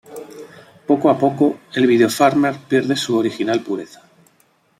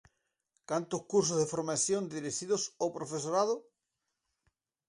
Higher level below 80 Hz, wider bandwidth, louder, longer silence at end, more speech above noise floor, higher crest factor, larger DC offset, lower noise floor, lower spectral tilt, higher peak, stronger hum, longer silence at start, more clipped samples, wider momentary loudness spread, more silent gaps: first, -64 dBFS vs -76 dBFS; first, 16 kHz vs 11.5 kHz; first, -17 LUFS vs -33 LUFS; second, 0.95 s vs 1.25 s; second, 42 dB vs 53 dB; about the same, 18 dB vs 18 dB; neither; second, -59 dBFS vs -86 dBFS; first, -5.5 dB/octave vs -4 dB/octave; first, -2 dBFS vs -16 dBFS; neither; second, 0.1 s vs 0.7 s; neither; first, 21 LU vs 7 LU; neither